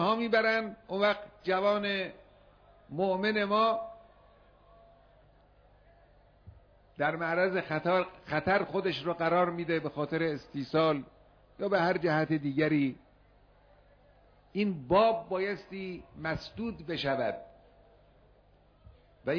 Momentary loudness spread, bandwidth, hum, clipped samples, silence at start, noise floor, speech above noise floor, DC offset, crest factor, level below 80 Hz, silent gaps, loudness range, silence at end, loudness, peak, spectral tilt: 12 LU; 5.4 kHz; 50 Hz at -60 dBFS; under 0.1%; 0 s; -63 dBFS; 33 dB; under 0.1%; 18 dB; -62 dBFS; none; 6 LU; 0 s; -30 LUFS; -14 dBFS; -7.5 dB/octave